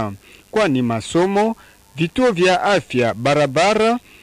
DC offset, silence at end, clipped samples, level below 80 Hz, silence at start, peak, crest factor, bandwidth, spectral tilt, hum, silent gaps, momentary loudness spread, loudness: under 0.1%; 0.25 s; under 0.1%; -50 dBFS; 0 s; -4 dBFS; 14 dB; 15.5 kHz; -5 dB/octave; none; none; 9 LU; -17 LUFS